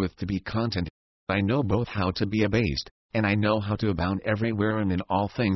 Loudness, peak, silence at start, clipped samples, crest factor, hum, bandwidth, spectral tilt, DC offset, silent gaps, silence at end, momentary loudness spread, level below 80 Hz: -26 LUFS; -10 dBFS; 0 s; under 0.1%; 16 dB; none; 6 kHz; -7.5 dB/octave; under 0.1%; 0.90-1.27 s, 2.91-3.09 s; 0 s; 7 LU; -42 dBFS